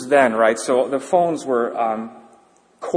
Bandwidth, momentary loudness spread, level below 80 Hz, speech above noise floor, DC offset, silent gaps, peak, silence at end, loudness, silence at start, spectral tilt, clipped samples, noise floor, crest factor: 10.5 kHz; 12 LU; -68 dBFS; 35 dB; under 0.1%; none; -2 dBFS; 0 s; -19 LUFS; 0 s; -4.5 dB/octave; under 0.1%; -54 dBFS; 18 dB